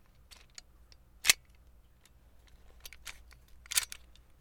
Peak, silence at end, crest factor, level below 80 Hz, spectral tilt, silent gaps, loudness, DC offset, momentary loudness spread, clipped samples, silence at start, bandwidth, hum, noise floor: -4 dBFS; 0.45 s; 36 dB; -60 dBFS; 2 dB/octave; none; -30 LUFS; under 0.1%; 25 LU; under 0.1%; 0.3 s; over 20 kHz; none; -62 dBFS